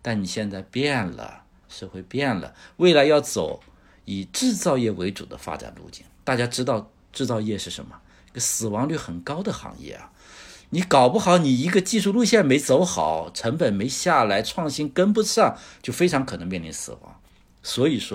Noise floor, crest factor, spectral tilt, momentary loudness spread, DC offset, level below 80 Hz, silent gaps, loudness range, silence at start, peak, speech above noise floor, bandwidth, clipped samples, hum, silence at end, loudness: -46 dBFS; 20 dB; -4.5 dB/octave; 20 LU; under 0.1%; -54 dBFS; none; 8 LU; 0.05 s; -4 dBFS; 23 dB; 16.5 kHz; under 0.1%; none; 0 s; -22 LUFS